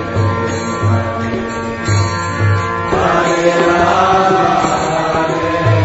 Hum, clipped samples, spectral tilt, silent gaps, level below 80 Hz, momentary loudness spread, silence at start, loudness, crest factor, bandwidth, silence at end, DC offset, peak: none; under 0.1%; -6 dB/octave; none; -38 dBFS; 7 LU; 0 s; -14 LUFS; 14 dB; 8 kHz; 0 s; under 0.1%; 0 dBFS